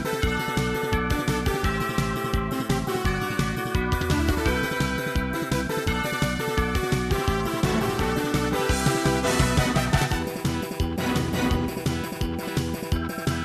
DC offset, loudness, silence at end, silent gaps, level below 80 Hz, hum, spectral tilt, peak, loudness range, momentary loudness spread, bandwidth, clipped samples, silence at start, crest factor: under 0.1%; -25 LUFS; 0 s; none; -34 dBFS; none; -5 dB/octave; -8 dBFS; 2 LU; 5 LU; 14 kHz; under 0.1%; 0 s; 18 dB